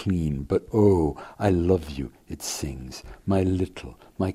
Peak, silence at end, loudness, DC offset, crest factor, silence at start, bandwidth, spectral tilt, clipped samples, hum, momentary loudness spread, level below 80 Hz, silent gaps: -6 dBFS; 0 s; -25 LUFS; under 0.1%; 18 dB; 0 s; 15.5 kHz; -6.5 dB/octave; under 0.1%; none; 16 LU; -42 dBFS; none